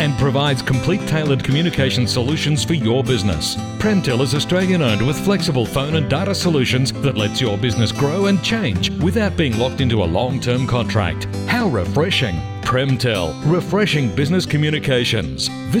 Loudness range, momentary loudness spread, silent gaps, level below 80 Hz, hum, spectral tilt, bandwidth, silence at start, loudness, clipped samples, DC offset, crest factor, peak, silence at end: 1 LU; 3 LU; none; -40 dBFS; none; -5.5 dB/octave; 18.5 kHz; 0 s; -18 LUFS; under 0.1%; under 0.1%; 12 dB; -6 dBFS; 0 s